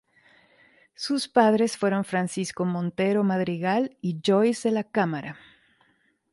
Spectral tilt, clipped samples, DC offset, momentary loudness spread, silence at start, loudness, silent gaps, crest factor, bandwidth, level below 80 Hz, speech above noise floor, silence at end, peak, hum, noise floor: -5.5 dB/octave; under 0.1%; under 0.1%; 8 LU; 1 s; -25 LUFS; none; 18 dB; 11.5 kHz; -70 dBFS; 43 dB; 1 s; -6 dBFS; none; -67 dBFS